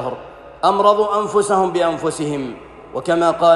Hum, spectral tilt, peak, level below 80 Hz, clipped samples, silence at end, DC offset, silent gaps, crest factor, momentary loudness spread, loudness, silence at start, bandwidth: none; -5 dB/octave; -2 dBFS; -52 dBFS; under 0.1%; 0 s; under 0.1%; none; 16 dB; 16 LU; -17 LUFS; 0 s; 12 kHz